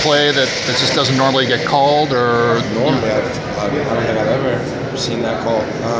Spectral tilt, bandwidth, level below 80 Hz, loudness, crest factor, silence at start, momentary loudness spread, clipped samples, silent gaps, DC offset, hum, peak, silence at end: -4.5 dB/octave; 8 kHz; -42 dBFS; -15 LUFS; 16 dB; 0 s; 6 LU; under 0.1%; none; under 0.1%; none; 0 dBFS; 0 s